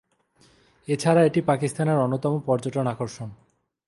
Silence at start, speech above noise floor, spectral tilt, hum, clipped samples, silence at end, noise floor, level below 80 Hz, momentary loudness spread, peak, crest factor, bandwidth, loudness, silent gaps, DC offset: 0.9 s; 38 dB; -7 dB/octave; none; under 0.1%; 0.55 s; -61 dBFS; -62 dBFS; 15 LU; -6 dBFS; 20 dB; 11.5 kHz; -23 LUFS; none; under 0.1%